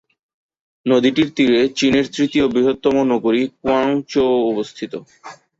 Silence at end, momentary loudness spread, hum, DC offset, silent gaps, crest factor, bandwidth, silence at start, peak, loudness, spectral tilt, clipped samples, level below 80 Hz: 0.25 s; 11 LU; none; under 0.1%; none; 16 dB; 7.8 kHz; 0.85 s; -2 dBFS; -17 LUFS; -5 dB/octave; under 0.1%; -52 dBFS